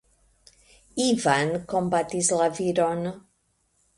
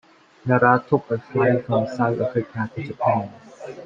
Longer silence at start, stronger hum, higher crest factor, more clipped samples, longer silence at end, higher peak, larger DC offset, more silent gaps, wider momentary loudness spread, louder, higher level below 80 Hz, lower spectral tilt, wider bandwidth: first, 0.95 s vs 0.45 s; neither; about the same, 18 dB vs 20 dB; neither; first, 0.8 s vs 0 s; second, -8 dBFS vs -2 dBFS; neither; neither; second, 11 LU vs 15 LU; second, -24 LUFS vs -21 LUFS; about the same, -60 dBFS vs -60 dBFS; second, -4 dB/octave vs -9 dB/octave; first, 11.5 kHz vs 7.4 kHz